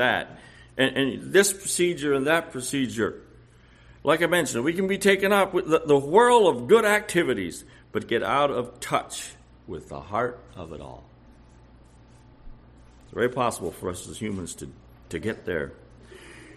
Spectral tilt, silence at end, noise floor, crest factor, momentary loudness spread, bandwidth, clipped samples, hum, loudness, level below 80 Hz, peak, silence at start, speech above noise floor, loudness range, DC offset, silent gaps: -4 dB/octave; 0.05 s; -53 dBFS; 22 dB; 20 LU; 14 kHz; under 0.1%; none; -24 LUFS; -54 dBFS; -4 dBFS; 0 s; 29 dB; 15 LU; under 0.1%; none